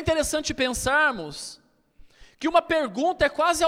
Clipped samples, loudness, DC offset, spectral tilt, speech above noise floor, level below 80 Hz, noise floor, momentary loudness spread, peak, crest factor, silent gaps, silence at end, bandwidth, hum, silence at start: under 0.1%; -23 LUFS; under 0.1%; -3 dB/octave; 29 dB; -46 dBFS; -53 dBFS; 13 LU; -6 dBFS; 18 dB; none; 0 s; 16.5 kHz; none; 0 s